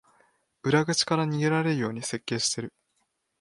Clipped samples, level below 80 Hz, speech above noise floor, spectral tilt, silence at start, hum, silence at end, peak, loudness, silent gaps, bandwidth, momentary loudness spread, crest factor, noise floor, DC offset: under 0.1%; -68 dBFS; 49 dB; -4 dB/octave; 0.65 s; none; 0.7 s; -8 dBFS; -26 LUFS; none; 11.5 kHz; 10 LU; 20 dB; -75 dBFS; under 0.1%